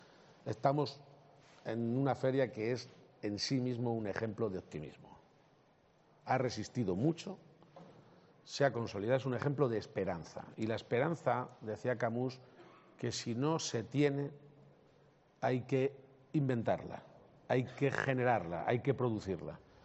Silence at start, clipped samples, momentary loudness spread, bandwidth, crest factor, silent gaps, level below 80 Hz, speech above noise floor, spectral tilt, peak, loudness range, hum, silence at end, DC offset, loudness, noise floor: 0.45 s; under 0.1%; 12 LU; 8 kHz; 22 dB; none; -74 dBFS; 33 dB; -5.5 dB/octave; -16 dBFS; 4 LU; none; 0.25 s; under 0.1%; -36 LUFS; -69 dBFS